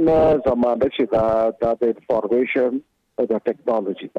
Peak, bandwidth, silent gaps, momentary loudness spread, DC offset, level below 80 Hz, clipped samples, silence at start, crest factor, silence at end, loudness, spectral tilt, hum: -8 dBFS; 6.4 kHz; none; 6 LU; under 0.1%; -46 dBFS; under 0.1%; 0 s; 10 dB; 0 s; -20 LUFS; -8 dB/octave; none